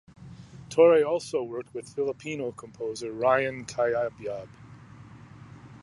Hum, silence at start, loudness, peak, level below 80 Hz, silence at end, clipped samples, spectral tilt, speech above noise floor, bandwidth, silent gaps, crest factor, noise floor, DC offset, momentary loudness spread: none; 0.2 s; -27 LUFS; -8 dBFS; -64 dBFS; 0.05 s; under 0.1%; -5 dB/octave; 22 dB; 11.5 kHz; none; 20 dB; -48 dBFS; under 0.1%; 27 LU